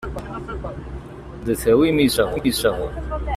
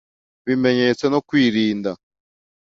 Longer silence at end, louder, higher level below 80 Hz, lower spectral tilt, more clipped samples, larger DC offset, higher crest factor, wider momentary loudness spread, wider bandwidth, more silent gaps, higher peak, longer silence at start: second, 0 s vs 0.75 s; about the same, -21 LUFS vs -19 LUFS; first, -34 dBFS vs -60 dBFS; about the same, -5 dB/octave vs -6 dB/octave; neither; neither; about the same, 16 dB vs 16 dB; first, 18 LU vs 12 LU; first, 15.5 kHz vs 7.6 kHz; neither; about the same, -6 dBFS vs -4 dBFS; second, 0 s vs 0.45 s